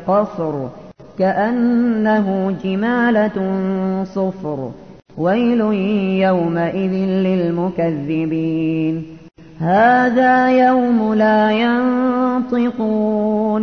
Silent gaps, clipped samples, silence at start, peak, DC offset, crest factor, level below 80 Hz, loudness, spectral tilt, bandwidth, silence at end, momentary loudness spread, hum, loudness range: none; under 0.1%; 0 s; -2 dBFS; 0.3%; 14 dB; -54 dBFS; -17 LUFS; -8.5 dB/octave; 6.4 kHz; 0 s; 9 LU; none; 5 LU